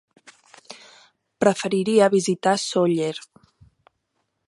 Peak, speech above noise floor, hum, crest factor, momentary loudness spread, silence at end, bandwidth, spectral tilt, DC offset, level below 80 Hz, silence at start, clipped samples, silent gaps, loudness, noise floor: -2 dBFS; 54 dB; none; 20 dB; 25 LU; 1.3 s; 11.5 kHz; -5 dB/octave; under 0.1%; -68 dBFS; 0.7 s; under 0.1%; none; -21 LUFS; -74 dBFS